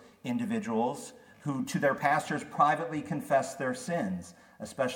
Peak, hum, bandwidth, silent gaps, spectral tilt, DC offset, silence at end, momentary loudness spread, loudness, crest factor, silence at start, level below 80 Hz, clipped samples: -10 dBFS; none; 18 kHz; none; -5.5 dB/octave; under 0.1%; 0 s; 15 LU; -31 LUFS; 20 dB; 0 s; -72 dBFS; under 0.1%